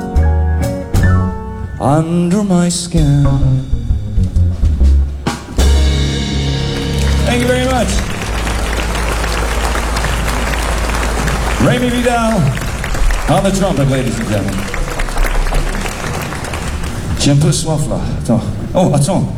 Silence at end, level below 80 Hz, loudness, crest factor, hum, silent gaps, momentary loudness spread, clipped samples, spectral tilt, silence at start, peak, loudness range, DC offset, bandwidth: 0 s; -18 dBFS; -15 LUFS; 12 dB; none; none; 8 LU; under 0.1%; -5.5 dB/octave; 0 s; -2 dBFS; 3 LU; under 0.1%; 16.5 kHz